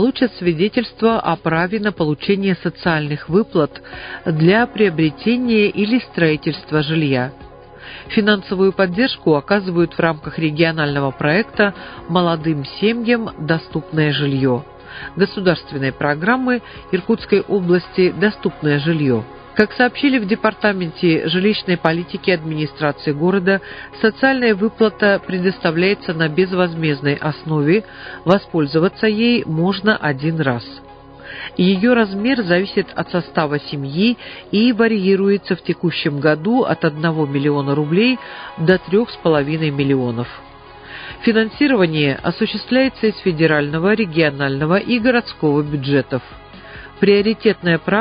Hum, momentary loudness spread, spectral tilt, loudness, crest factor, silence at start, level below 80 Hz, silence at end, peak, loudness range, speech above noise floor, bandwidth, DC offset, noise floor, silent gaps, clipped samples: none; 7 LU; -9.5 dB/octave; -17 LUFS; 18 dB; 0 s; -48 dBFS; 0 s; 0 dBFS; 2 LU; 21 dB; 5.2 kHz; under 0.1%; -38 dBFS; none; under 0.1%